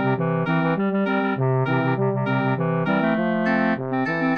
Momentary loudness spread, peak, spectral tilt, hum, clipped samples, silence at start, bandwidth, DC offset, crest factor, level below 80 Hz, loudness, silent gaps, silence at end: 2 LU; -8 dBFS; -9.5 dB/octave; none; under 0.1%; 0 s; 6 kHz; 0.2%; 12 dB; -64 dBFS; -22 LUFS; none; 0 s